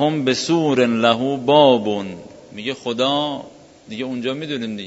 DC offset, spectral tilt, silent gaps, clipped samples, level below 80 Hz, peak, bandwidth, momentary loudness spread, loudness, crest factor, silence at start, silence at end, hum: under 0.1%; -5 dB/octave; none; under 0.1%; -62 dBFS; 0 dBFS; 8 kHz; 18 LU; -19 LUFS; 18 dB; 0 s; 0 s; none